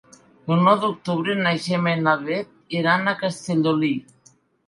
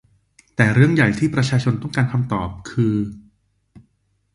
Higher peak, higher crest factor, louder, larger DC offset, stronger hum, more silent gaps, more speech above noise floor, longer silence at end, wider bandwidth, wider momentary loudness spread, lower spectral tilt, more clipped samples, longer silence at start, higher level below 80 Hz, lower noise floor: about the same, -4 dBFS vs -2 dBFS; about the same, 18 dB vs 20 dB; about the same, -21 LUFS vs -19 LUFS; neither; neither; neither; second, 37 dB vs 47 dB; second, 0.65 s vs 1.15 s; about the same, 11.5 kHz vs 11 kHz; about the same, 10 LU vs 11 LU; about the same, -6 dB/octave vs -7 dB/octave; neither; second, 0.45 s vs 0.6 s; second, -68 dBFS vs -46 dBFS; second, -57 dBFS vs -65 dBFS